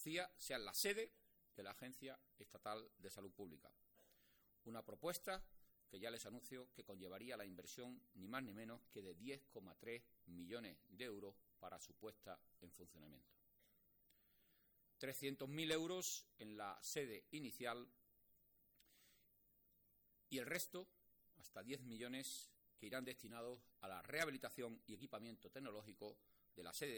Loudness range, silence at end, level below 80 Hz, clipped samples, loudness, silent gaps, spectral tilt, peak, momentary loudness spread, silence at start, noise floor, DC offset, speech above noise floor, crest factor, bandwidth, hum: 9 LU; 0 s; -80 dBFS; under 0.1%; -51 LUFS; none; -3 dB/octave; -28 dBFS; 16 LU; 0 s; -78 dBFS; under 0.1%; 26 dB; 26 dB; 19 kHz; none